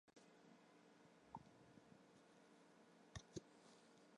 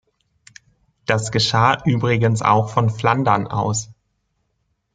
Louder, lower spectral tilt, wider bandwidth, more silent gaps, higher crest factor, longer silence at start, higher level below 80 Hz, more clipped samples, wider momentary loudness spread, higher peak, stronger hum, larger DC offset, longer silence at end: second, -64 LUFS vs -18 LUFS; about the same, -4.5 dB/octave vs -5 dB/octave; first, 11 kHz vs 9.4 kHz; neither; first, 28 dB vs 18 dB; second, 0.05 s vs 1.1 s; second, -78 dBFS vs -52 dBFS; neither; first, 11 LU vs 7 LU; second, -38 dBFS vs -2 dBFS; neither; neither; second, 0 s vs 1 s